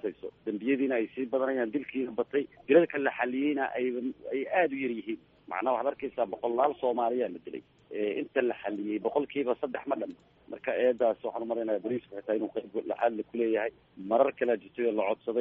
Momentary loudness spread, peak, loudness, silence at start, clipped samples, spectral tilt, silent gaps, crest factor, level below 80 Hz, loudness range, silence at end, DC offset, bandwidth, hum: 10 LU; -10 dBFS; -30 LUFS; 0.05 s; under 0.1%; -4 dB/octave; none; 20 dB; -72 dBFS; 3 LU; 0 s; under 0.1%; 3.9 kHz; none